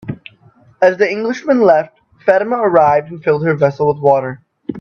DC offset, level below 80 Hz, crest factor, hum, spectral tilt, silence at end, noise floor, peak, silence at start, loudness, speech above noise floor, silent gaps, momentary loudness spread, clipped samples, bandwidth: under 0.1%; -56 dBFS; 14 dB; none; -7.5 dB/octave; 0 s; -48 dBFS; 0 dBFS; 0.05 s; -14 LUFS; 35 dB; none; 18 LU; under 0.1%; 7 kHz